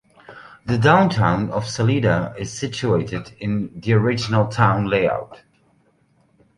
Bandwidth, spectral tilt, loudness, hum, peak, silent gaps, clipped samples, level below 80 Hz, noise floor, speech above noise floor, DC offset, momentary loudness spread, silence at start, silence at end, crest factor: 11 kHz; -6.5 dB/octave; -20 LUFS; none; -2 dBFS; none; under 0.1%; -46 dBFS; -60 dBFS; 41 dB; under 0.1%; 13 LU; 0.3 s; 1.2 s; 20 dB